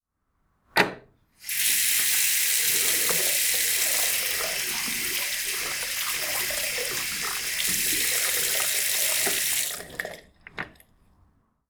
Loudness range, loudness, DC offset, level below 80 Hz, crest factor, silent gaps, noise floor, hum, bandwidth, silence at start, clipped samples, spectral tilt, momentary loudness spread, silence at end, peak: 5 LU; -23 LUFS; under 0.1%; -58 dBFS; 22 dB; none; -73 dBFS; none; over 20 kHz; 0.75 s; under 0.1%; 1 dB/octave; 10 LU; 1 s; -4 dBFS